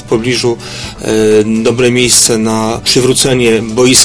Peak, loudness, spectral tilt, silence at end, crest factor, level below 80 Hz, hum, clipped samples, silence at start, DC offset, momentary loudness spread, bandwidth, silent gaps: 0 dBFS; -9 LUFS; -3 dB/octave; 0 s; 10 dB; -36 dBFS; none; 0.7%; 0 s; under 0.1%; 9 LU; 11 kHz; none